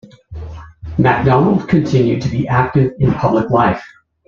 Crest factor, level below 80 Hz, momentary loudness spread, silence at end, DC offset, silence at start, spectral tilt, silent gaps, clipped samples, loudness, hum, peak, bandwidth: 14 dB; -38 dBFS; 19 LU; 0.4 s; under 0.1%; 0.3 s; -8.5 dB/octave; none; under 0.1%; -14 LUFS; none; 0 dBFS; 7.2 kHz